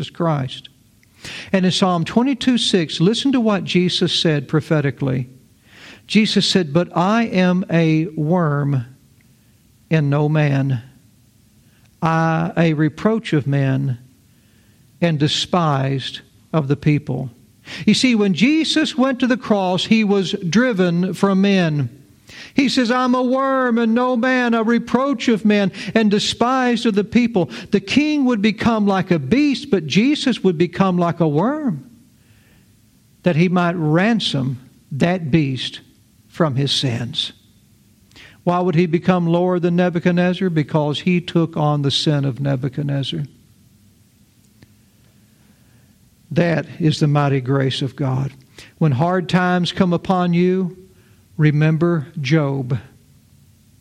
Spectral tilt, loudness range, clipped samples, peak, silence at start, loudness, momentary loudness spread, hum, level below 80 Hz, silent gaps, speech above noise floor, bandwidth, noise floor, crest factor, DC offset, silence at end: -6 dB/octave; 4 LU; under 0.1%; -2 dBFS; 0 s; -18 LUFS; 8 LU; none; -56 dBFS; none; 36 dB; 11 kHz; -53 dBFS; 16 dB; under 0.1%; 1 s